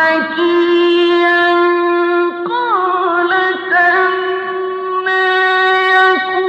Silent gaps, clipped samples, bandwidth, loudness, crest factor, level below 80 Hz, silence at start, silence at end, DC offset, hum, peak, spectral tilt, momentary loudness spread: none; under 0.1%; 6.4 kHz; -12 LUFS; 10 dB; -64 dBFS; 0 s; 0 s; under 0.1%; none; -2 dBFS; -4.5 dB/octave; 7 LU